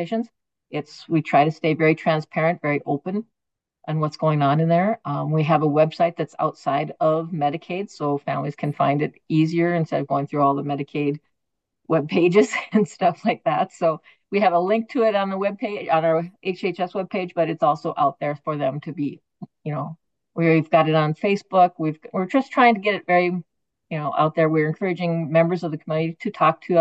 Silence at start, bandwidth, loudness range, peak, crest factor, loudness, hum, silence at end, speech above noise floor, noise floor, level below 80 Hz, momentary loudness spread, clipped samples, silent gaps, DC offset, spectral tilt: 0 s; 8.2 kHz; 3 LU; -4 dBFS; 18 dB; -22 LUFS; none; 0 s; 62 dB; -83 dBFS; -72 dBFS; 11 LU; under 0.1%; none; under 0.1%; -7.5 dB/octave